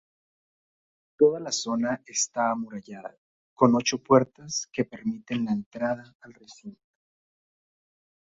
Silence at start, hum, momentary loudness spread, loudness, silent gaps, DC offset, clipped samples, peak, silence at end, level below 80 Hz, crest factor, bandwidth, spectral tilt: 1.2 s; none; 20 LU; -26 LUFS; 3.18-3.57 s, 5.66-5.71 s, 6.15-6.20 s; under 0.1%; under 0.1%; -6 dBFS; 1.55 s; -68 dBFS; 24 dB; 8 kHz; -4 dB/octave